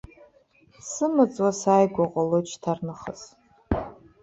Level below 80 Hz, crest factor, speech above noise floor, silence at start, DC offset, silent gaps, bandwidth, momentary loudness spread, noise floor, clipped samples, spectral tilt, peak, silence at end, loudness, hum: -48 dBFS; 18 dB; 35 dB; 0.85 s; under 0.1%; none; 8.4 kHz; 18 LU; -59 dBFS; under 0.1%; -6 dB/octave; -6 dBFS; 0.3 s; -24 LUFS; none